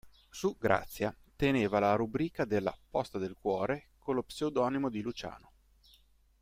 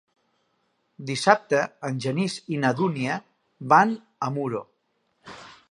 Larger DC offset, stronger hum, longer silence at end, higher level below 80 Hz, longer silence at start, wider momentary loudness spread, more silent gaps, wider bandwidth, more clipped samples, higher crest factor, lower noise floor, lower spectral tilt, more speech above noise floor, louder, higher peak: neither; neither; first, 1.05 s vs 0.2 s; first, -58 dBFS vs -72 dBFS; second, 0.05 s vs 1 s; second, 10 LU vs 21 LU; neither; first, 16 kHz vs 11.5 kHz; neither; about the same, 22 dB vs 24 dB; second, -65 dBFS vs -72 dBFS; about the same, -6 dB/octave vs -5.5 dB/octave; second, 33 dB vs 48 dB; second, -33 LUFS vs -24 LUFS; second, -12 dBFS vs -2 dBFS